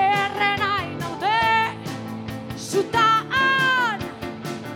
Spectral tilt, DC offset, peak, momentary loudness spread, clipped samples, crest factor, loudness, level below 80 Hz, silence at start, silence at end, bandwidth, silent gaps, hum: -4 dB/octave; under 0.1%; -8 dBFS; 14 LU; under 0.1%; 16 dB; -21 LUFS; -54 dBFS; 0 s; 0 s; 18 kHz; none; none